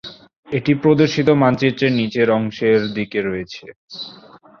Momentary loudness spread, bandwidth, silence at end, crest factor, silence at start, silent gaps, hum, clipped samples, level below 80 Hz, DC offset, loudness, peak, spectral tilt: 18 LU; 6.8 kHz; 0.5 s; 16 dB; 0.05 s; 0.36-0.43 s, 3.76-3.88 s; none; under 0.1%; -54 dBFS; under 0.1%; -17 LUFS; -2 dBFS; -7 dB/octave